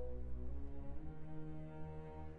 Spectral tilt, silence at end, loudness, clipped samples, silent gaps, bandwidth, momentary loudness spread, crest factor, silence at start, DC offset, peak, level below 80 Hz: -10 dB/octave; 0 s; -51 LUFS; under 0.1%; none; 3.6 kHz; 3 LU; 10 dB; 0 s; under 0.1%; -32 dBFS; -50 dBFS